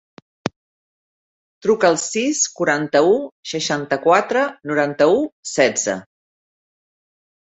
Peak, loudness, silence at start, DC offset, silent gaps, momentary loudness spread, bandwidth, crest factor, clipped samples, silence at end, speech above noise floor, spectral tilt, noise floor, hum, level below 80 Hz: -2 dBFS; -18 LUFS; 0.45 s; under 0.1%; 0.56-1.61 s, 3.32-3.43 s, 5.32-5.43 s; 11 LU; 8.2 kHz; 18 dB; under 0.1%; 1.55 s; over 72 dB; -3 dB/octave; under -90 dBFS; none; -64 dBFS